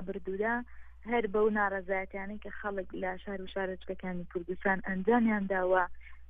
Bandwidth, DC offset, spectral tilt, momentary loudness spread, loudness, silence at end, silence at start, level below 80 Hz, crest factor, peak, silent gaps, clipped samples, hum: 3.9 kHz; under 0.1%; -9.5 dB/octave; 12 LU; -33 LUFS; 0 s; 0 s; -54 dBFS; 18 dB; -14 dBFS; none; under 0.1%; none